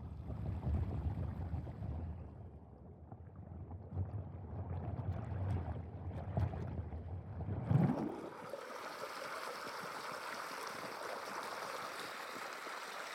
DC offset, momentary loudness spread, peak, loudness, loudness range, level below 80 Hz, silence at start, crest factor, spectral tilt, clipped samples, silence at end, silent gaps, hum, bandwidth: under 0.1%; 11 LU; -20 dBFS; -43 LUFS; 7 LU; -54 dBFS; 0 s; 22 dB; -6 dB/octave; under 0.1%; 0 s; none; none; 16.5 kHz